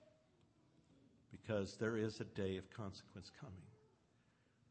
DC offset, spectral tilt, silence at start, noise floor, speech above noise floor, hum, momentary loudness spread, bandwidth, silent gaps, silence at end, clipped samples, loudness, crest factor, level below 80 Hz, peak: under 0.1%; -6 dB/octave; 0 s; -76 dBFS; 31 dB; none; 17 LU; 8.4 kHz; none; 0.95 s; under 0.1%; -45 LUFS; 20 dB; -76 dBFS; -28 dBFS